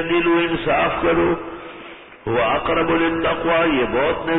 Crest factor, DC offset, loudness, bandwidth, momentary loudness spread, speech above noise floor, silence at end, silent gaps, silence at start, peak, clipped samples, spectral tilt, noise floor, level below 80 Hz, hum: 12 dB; under 0.1%; -19 LUFS; 4 kHz; 16 LU; 21 dB; 0 s; none; 0 s; -8 dBFS; under 0.1%; -10.5 dB/octave; -39 dBFS; -42 dBFS; none